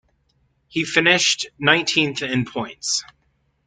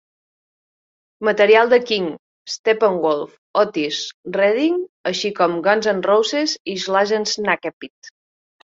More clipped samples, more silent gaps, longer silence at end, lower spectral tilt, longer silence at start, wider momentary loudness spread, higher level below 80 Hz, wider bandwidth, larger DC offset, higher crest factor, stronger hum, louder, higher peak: neither; second, none vs 2.19-2.45 s, 2.59-2.64 s, 3.38-3.54 s, 4.14-4.23 s, 4.89-5.04 s, 6.60-6.65 s, 7.73-7.80 s, 7.90-8.02 s; about the same, 0.65 s vs 0.55 s; about the same, -2.5 dB/octave vs -3.5 dB/octave; second, 0.75 s vs 1.2 s; about the same, 11 LU vs 11 LU; first, -60 dBFS vs -66 dBFS; first, 9.6 kHz vs 7.8 kHz; neither; about the same, 22 dB vs 18 dB; neither; about the same, -19 LUFS vs -18 LUFS; about the same, 0 dBFS vs -2 dBFS